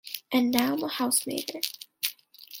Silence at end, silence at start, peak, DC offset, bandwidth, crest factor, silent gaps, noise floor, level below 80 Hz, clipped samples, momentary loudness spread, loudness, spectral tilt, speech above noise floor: 0 s; 0.05 s; 0 dBFS; under 0.1%; 17 kHz; 28 dB; none; -48 dBFS; -70 dBFS; under 0.1%; 8 LU; -28 LUFS; -2 dB/octave; 21 dB